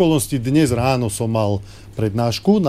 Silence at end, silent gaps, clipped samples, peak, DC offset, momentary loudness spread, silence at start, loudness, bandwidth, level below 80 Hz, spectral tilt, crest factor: 0 s; none; under 0.1%; -2 dBFS; 0.3%; 7 LU; 0 s; -19 LUFS; 15.5 kHz; -42 dBFS; -6 dB/octave; 16 dB